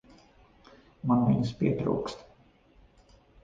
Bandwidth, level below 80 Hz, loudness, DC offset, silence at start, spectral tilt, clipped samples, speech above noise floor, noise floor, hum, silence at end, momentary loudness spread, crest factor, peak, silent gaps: 7.6 kHz; -56 dBFS; -28 LUFS; under 0.1%; 1.05 s; -8.5 dB/octave; under 0.1%; 33 dB; -60 dBFS; none; 1.2 s; 14 LU; 18 dB; -12 dBFS; none